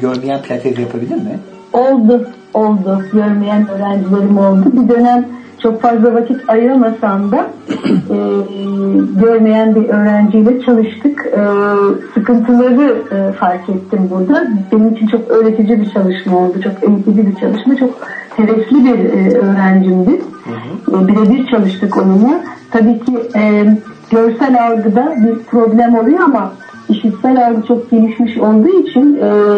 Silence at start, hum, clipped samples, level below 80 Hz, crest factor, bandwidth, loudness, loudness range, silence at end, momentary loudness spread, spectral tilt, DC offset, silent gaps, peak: 0 s; none; under 0.1%; -54 dBFS; 10 dB; 6 kHz; -11 LUFS; 2 LU; 0 s; 8 LU; -9 dB/octave; under 0.1%; none; 0 dBFS